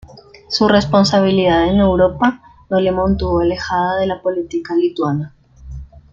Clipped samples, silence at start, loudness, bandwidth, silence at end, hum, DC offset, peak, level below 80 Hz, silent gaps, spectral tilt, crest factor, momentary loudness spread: under 0.1%; 0.05 s; -16 LUFS; 7.6 kHz; 0.15 s; none; under 0.1%; 0 dBFS; -34 dBFS; none; -6.5 dB/octave; 16 dB; 16 LU